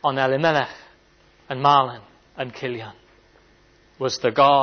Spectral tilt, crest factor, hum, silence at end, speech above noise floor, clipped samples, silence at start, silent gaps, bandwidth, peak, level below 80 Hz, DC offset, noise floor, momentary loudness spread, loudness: -5 dB/octave; 18 dB; none; 0 s; 36 dB; under 0.1%; 0.05 s; none; 6.6 kHz; -4 dBFS; -62 dBFS; under 0.1%; -56 dBFS; 16 LU; -21 LUFS